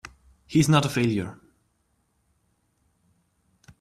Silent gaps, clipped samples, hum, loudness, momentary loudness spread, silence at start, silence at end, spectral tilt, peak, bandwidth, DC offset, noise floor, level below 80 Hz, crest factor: none; under 0.1%; none; -23 LUFS; 10 LU; 0.5 s; 2.45 s; -5.5 dB/octave; -4 dBFS; 14.5 kHz; under 0.1%; -71 dBFS; -58 dBFS; 24 dB